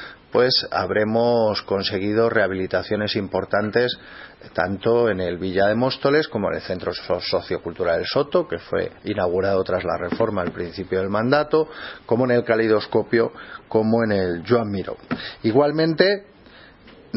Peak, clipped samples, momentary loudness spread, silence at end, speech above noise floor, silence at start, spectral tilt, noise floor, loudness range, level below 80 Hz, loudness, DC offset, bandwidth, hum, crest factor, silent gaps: 0 dBFS; under 0.1%; 9 LU; 0 s; 26 dB; 0 s; -9 dB/octave; -47 dBFS; 2 LU; -54 dBFS; -21 LUFS; under 0.1%; 6 kHz; none; 20 dB; none